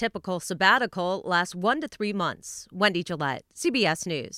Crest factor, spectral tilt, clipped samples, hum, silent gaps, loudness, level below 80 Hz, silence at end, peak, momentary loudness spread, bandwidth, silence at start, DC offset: 22 dB; -3.5 dB/octave; under 0.1%; none; none; -26 LUFS; -64 dBFS; 0 s; -6 dBFS; 10 LU; 16 kHz; 0 s; under 0.1%